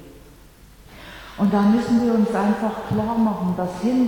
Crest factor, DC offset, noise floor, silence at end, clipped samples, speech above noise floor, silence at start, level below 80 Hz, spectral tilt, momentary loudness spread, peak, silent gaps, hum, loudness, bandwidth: 14 dB; under 0.1%; -47 dBFS; 0 s; under 0.1%; 27 dB; 0 s; -48 dBFS; -7.5 dB/octave; 9 LU; -8 dBFS; none; none; -20 LUFS; 17.5 kHz